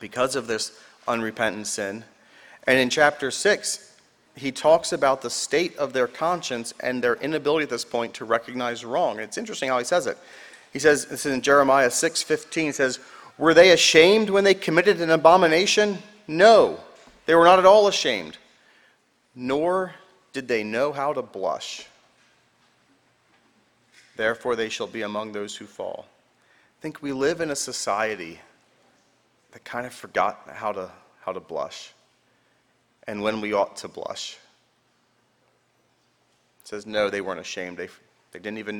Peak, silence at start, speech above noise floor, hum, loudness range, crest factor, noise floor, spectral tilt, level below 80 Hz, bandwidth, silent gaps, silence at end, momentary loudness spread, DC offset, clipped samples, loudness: 0 dBFS; 0 s; 44 dB; none; 15 LU; 24 dB; -66 dBFS; -3 dB/octave; -62 dBFS; 18.5 kHz; none; 0 s; 20 LU; under 0.1%; under 0.1%; -22 LUFS